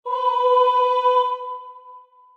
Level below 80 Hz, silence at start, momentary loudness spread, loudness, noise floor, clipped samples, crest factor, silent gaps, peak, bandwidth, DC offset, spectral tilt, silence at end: under -90 dBFS; 0.05 s; 15 LU; -19 LUFS; -46 dBFS; under 0.1%; 14 dB; none; -8 dBFS; 6.8 kHz; under 0.1%; 0.5 dB/octave; 0.35 s